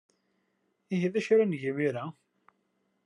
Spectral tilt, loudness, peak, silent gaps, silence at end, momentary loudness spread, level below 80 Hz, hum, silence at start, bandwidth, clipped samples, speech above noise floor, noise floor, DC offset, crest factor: -7 dB/octave; -29 LUFS; -14 dBFS; none; 0.95 s; 12 LU; -84 dBFS; none; 0.9 s; 10.5 kHz; under 0.1%; 48 dB; -76 dBFS; under 0.1%; 18 dB